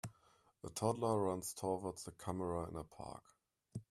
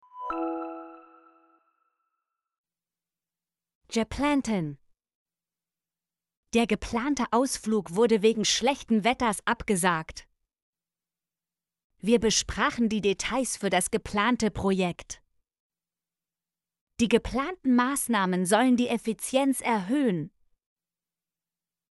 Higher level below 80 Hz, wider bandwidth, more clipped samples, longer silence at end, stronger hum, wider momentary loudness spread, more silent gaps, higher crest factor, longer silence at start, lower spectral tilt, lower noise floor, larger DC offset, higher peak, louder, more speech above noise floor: second, -68 dBFS vs -52 dBFS; first, 15 kHz vs 12 kHz; neither; second, 0.1 s vs 1.65 s; neither; first, 17 LU vs 11 LU; second, none vs 2.58-2.64 s, 3.75-3.81 s, 5.15-5.26 s, 6.37-6.43 s, 10.62-10.73 s, 11.84-11.90 s, 15.60-15.70 s, 16.81-16.87 s; about the same, 22 dB vs 20 dB; about the same, 0.05 s vs 0.15 s; first, -6 dB/octave vs -4 dB/octave; second, -72 dBFS vs under -90 dBFS; neither; second, -20 dBFS vs -8 dBFS; second, -41 LUFS vs -26 LUFS; second, 31 dB vs over 64 dB